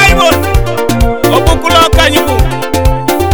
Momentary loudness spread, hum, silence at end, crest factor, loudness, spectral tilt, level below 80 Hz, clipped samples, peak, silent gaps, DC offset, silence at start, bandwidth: 6 LU; none; 0 s; 8 dB; -9 LUFS; -4.5 dB/octave; -14 dBFS; 1%; 0 dBFS; none; 6%; 0 s; over 20 kHz